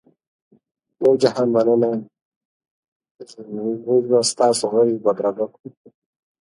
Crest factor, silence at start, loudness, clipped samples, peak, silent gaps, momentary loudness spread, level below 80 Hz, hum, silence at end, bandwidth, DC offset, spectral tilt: 18 dB; 1 s; -19 LUFS; under 0.1%; -4 dBFS; 2.22-2.60 s, 2.71-3.00 s, 3.11-3.15 s, 5.60-5.64 s; 12 LU; -70 dBFS; none; 0.9 s; 11.5 kHz; under 0.1%; -4.5 dB/octave